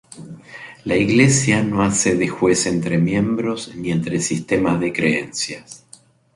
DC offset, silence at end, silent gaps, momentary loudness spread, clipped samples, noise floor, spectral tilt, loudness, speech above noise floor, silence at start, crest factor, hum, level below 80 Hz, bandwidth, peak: under 0.1%; 0.6 s; none; 21 LU; under 0.1%; -49 dBFS; -4.5 dB/octave; -18 LUFS; 31 dB; 0.15 s; 18 dB; none; -48 dBFS; 11.5 kHz; -2 dBFS